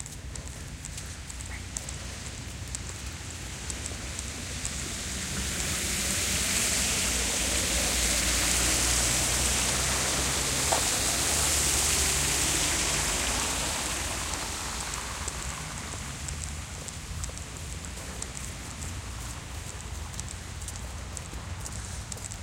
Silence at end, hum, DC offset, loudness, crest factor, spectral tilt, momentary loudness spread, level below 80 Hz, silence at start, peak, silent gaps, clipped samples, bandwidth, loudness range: 0 s; none; under 0.1%; -28 LUFS; 22 dB; -1.5 dB/octave; 15 LU; -40 dBFS; 0 s; -8 dBFS; none; under 0.1%; 17 kHz; 13 LU